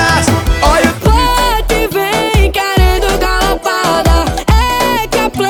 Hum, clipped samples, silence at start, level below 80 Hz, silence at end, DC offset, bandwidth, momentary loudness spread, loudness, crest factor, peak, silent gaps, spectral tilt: none; under 0.1%; 0 s; -16 dBFS; 0 s; under 0.1%; 19.5 kHz; 3 LU; -11 LUFS; 10 dB; 0 dBFS; none; -4.5 dB/octave